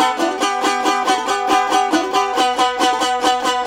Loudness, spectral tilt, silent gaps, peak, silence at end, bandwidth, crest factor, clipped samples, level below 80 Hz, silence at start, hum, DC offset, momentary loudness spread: -16 LUFS; -1 dB/octave; none; -2 dBFS; 0 s; 17 kHz; 14 dB; under 0.1%; -54 dBFS; 0 s; none; under 0.1%; 2 LU